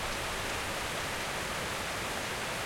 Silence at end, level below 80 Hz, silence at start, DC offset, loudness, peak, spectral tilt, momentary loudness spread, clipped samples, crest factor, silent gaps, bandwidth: 0 s; -50 dBFS; 0 s; under 0.1%; -34 LUFS; -22 dBFS; -2.5 dB/octave; 0 LU; under 0.1%; 14 dB; none; 16.5 kHz